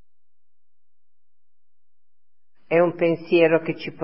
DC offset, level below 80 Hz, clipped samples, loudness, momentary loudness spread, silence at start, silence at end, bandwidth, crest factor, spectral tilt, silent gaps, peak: 0.6%; -76 dBFS; under 0.1%; -20 LUFS; 6 LU; 2.7 s; 0 s; 5.8 kHz; 20 dB; -10.5 dB/octave; none; -4 dBFS